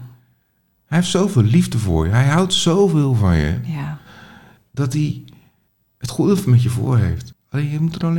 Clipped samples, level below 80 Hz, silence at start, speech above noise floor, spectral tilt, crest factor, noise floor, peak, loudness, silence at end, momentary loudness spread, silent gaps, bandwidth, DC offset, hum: under 0.1%; -38 dBFS; 0 s; 48 dB; -6 dB/octave; 14 dB; -64 dBFS; -4 dBFS; -17 LUFS; 0 s; 13 LU; none; 17 kHz; under 0.1%; none